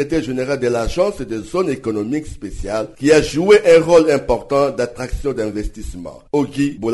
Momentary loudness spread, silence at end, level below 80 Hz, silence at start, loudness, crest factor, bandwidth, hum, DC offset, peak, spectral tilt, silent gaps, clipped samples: 16 LU; 0 s; -34 dBFS; 0 s; -17 LUFS; 16 dB; 11.5 kHz; none; under 0.1%; -2 dBFS; -5.5 dB/octave; none; under 0.1%